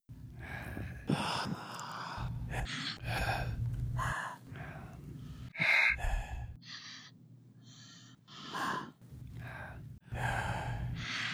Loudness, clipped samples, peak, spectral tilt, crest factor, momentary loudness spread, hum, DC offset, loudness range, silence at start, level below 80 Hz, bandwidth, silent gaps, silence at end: -36 LUFS; under 0.1%; -16 dBFS; -4.5 dB/octave; 22 dB; 18 LU; none; under 0.1%; 11 LU; 0.1 s; -46 dBFS; 16 kHz; none; 0 s